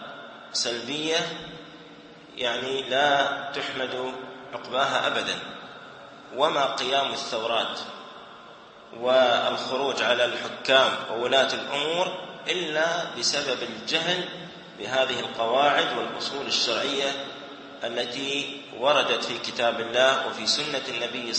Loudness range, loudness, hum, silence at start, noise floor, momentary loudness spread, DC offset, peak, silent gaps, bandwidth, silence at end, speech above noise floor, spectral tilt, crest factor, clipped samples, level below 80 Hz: 4 LU; -25 LUFS; none; 0 s; -47 dBFS; 18 LU; under 0.1%; -6 dBFS; none; 8.8 kHz; 0 s; 21 dB; -2 dB/octave; 22 dB; under 0.1%; -70 dBFS